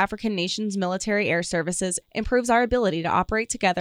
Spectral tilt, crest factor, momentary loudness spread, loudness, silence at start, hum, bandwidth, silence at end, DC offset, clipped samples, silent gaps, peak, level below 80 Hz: -4 dB/octave; 16 dB; 5 LU; -24 LUFS; 0 s; none; 15 kHz; 0 s; under 0.1%; under 0.1%; none; -8 dBFS; -44 dBFS